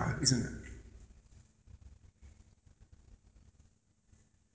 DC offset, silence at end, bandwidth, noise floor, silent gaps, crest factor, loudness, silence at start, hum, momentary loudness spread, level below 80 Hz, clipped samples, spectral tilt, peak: under 0.1%; 1.4 s; 8 kHz; -70 dBFS; none; 28 dB; -33 LUFS; 0 s; none; 30 LU; -56 dBFS; under 0.1%; -3.5 dB/octave; -12 dBFS